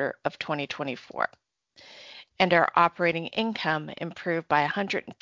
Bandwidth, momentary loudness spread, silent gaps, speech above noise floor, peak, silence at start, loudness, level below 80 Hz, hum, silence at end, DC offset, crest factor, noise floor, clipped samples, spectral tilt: 7.6 kHz; 14 LU; none; 27 dB; -6 dBFS; 0 s; -27 LUFS; -68 dBFS; none; 0.1 s; under 0.1%; 22 dB; -54 dBFS; under 0.1%; -5.5 dB/octave